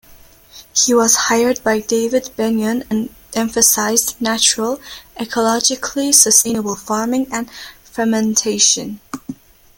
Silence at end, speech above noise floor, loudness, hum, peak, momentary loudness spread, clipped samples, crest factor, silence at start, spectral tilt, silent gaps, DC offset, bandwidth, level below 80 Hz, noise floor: 0.45 s; 28 dB; -15 LUFS; none; 0 dBFS; 17 LU; under 0.1%; 18 dB; 0.1 s; -1.5 dB/octave; none; under 0.1%; 17 kHz; -52 dBFS; -44 dBFS